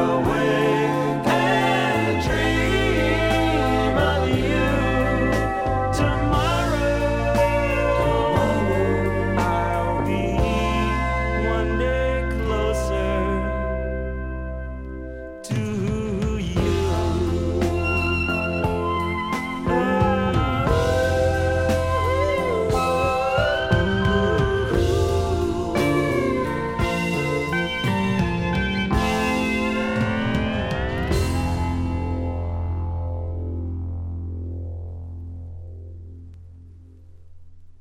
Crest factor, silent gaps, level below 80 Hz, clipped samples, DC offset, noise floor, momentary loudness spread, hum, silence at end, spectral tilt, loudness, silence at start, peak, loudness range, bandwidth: 16 dB; none; -30 dBFS; under 0.1%; under 0.1%; -44 dBFS; 10 LU; none; 0.05 s; -6.5 dB/octave; -22 LUFS; 0 s; -6 dBFS; 7 LU; 16 kHz